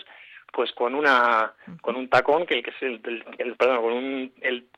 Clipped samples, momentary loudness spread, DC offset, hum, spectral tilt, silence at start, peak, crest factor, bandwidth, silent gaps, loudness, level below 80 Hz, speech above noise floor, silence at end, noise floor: under 0.1%; 14 LU; under 0.1%; none; -4.5 dB/octave; 0.2 s; -6 dBFS; 18 dB; 10.5 kHz; none; -24 LUFS; -66 dBFS; 24 dB; 0.2 s; -48 dBFS